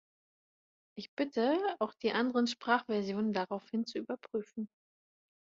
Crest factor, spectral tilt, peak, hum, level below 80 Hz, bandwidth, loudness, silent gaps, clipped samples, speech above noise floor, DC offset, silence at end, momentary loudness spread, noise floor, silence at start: 22 dB; -5.5 dB/octave; -14 dBFS; none; -80 dBFS; 7.8 kHz; -34 LUFS; 1.08-1.17 s; under 0.1%; over 56 dB; under 0.1%; 0.85 s; 13 LU; under -90 dBFS; 0.95 s